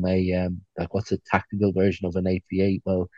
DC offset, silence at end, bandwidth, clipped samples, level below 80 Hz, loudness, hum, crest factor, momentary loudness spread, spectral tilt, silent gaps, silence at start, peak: under 0.1%; 0.1 s; 7.2 kHz; under 0.1%; -52 dBFS; -25 LUFS; none; 20 dB; 7 LU; -8 dB/octave; none; 0 s; -4 dBFS